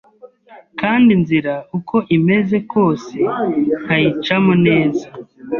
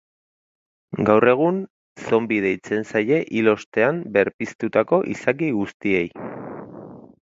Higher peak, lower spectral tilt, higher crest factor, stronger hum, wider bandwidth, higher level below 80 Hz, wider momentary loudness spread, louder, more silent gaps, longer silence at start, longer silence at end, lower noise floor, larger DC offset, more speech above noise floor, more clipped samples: about the same, -2 dBFS vs 0 dBFS; about the same, -8 dB/octave vs -7 dB/octave; second, 14 dB vs 20 dB; neither; second, 7 kHz vs 7.8 kHz; first, -54 dBFS vs -60 dBFS; second, 11 LU vs 17 LU; first, -16 LUFS vs -21 LUFS; second, none vs 1.70-1.96 s, 3.66-3.72 s, 4.34-4.39 s, 4.55-4.59 s, 5.74-5.80 s; second, 0.25 s vs 0.9 s; second, 0 s vs 0.2 s; about the same, -43 dBFS vs -40 dBFS; neither; first, 28 dB vs 20 dB; neither